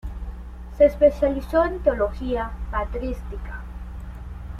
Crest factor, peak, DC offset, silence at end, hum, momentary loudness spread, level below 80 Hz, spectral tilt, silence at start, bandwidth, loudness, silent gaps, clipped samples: 18 dB; -6 dBFS; under 0.1%; 0 s; none; 19 LU; -32 dBFS; -8 dB/octave; 0.05 s; 13 kHz; -22 LUFS; none; under 0.1%